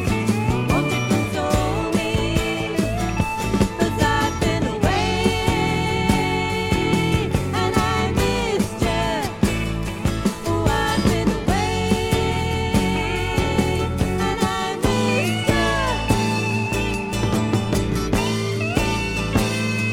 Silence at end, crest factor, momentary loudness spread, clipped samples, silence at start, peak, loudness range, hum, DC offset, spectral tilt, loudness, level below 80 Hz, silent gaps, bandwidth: 0 s; 18 dB; 3 LU; under 0.1%; 0 s; -2 dBFS; 1 LU; none; under 0.1%; -5.5 dB/octave; -21 LUFS; -32 dBFS; none; 17 kHz